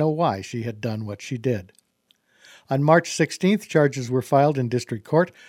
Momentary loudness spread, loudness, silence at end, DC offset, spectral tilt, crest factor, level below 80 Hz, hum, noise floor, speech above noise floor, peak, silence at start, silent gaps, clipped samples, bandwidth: 11 LU; -23 LUFS; 0.2 s; under 0.1%; -6 dB/octave; 22 dB; -66 dBFS; none; -66 dBFS; 44 dB; -2 dBFS; 0 s; none; under 0.1%; 15.5 kHz